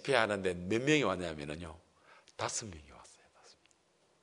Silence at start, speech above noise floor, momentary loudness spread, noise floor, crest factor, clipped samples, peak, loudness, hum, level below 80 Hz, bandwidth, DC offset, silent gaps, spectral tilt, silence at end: 0 s; 38 dB; 22 LU; -72 dBFS; 26 dB; under 0.1%; -12 dBFS; -34 LUFS; none; -66 dBFS; 11 kHz; under 0.1%; none; -4 dB/octave; 1.15 s